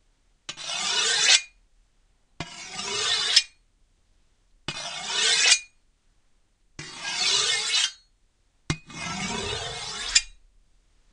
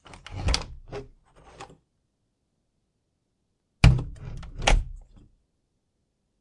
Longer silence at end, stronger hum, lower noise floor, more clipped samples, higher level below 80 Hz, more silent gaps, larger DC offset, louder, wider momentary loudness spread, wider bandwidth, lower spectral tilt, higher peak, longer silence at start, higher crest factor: second, 0.8 s vs 1.4 s; neither; second, -65 dBFS vs -76 dBFS; neither; second, -54 dBFS vs -32 dBFS; neither; neither; about the same, -23 LUFS vs -25 LUFS; second, 21 LU vs 26 LU; about the same, 10.5 kHz vs 11.5 kHz; second, 0.5 dB/octave vs -4.5 dB/octave; about the same, -2 dBFS vs -2 dBFS; first, 0.5 s vs 0.3 s; about the same, 26 dB vs 28 dB